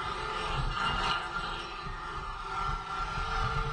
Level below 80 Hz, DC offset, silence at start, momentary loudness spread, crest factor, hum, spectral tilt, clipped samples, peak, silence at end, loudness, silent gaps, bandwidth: -40 dBFS; under 0.1%; 0 s; 8 LU; 16 dB; none; -4 dB/octave; under 0.1%; -16 dBFS; 0 s; -34 LUFS; none; 10.5 kHz